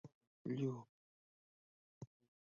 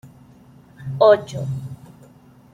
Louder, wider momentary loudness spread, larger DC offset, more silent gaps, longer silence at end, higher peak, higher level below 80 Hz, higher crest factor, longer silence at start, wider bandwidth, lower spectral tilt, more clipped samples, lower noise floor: second, -45 LUFS vs -18 LUFS; about the same, 21 LU vs 22 LU; neither; first, 0.15-0.21 s, 0.27-0.45 s, 0.89-2.01 s vs none; second, 0.45 s vs 0.8 s; second, -30 dBFS vs -2 dBFS; second, -86 dBFS vs -56 dBFS; about the same, 20 dB vs 20 dB; about the same, 0.05 s vs 0.05 s; second, 7 kHz vs 10.5 kHz; first, -8.5 dB/octave vs -6.5 dB/octave; neither; first, under -90 dBFS vs -49 dBFS